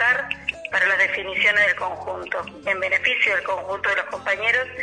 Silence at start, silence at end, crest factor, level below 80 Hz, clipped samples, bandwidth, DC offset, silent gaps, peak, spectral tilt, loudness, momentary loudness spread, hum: 0 s; 0 s; 16 dB; -56 dBFS; under 0.1%; 10.5 kHz; under 0.1%; none; -6 dBFS; -2.5 dB/octave; -21 LUFS; 10 LU; none